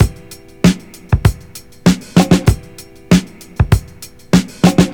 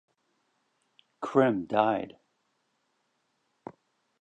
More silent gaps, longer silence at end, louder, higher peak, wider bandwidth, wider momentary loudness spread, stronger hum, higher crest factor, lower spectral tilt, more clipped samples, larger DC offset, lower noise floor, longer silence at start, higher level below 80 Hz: neither; second, 0 s vs 2.1 s; first, -14 LUFS vs -27 LUFS; first, 0 dBFS vs -8 dBFS; first, 18.5 kHz vs 8.4 kHz; second, 19 LU vs 24 LU; neither; second, 14 dB vs 24 dB; second, -6 dB/octave vs -7.5 dB/octave; neither; neither; second, -36 dBFS vs -76 dBFS; second, 0 s vs 1.2 s; first, -26 dBFS vs -74 dBFS